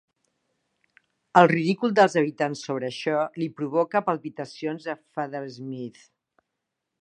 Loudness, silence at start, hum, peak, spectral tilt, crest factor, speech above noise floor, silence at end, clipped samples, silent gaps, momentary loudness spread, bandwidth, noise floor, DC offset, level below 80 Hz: -24 LUFS; 1.35 s; none; -2 dBFS; -6 dB/octave; 24 dB; 58 dB; 1.1 s; under 0.1%; none; 16 LU; 9.8 kHz; -83 dBFS; under 0.1%; -78 dBFS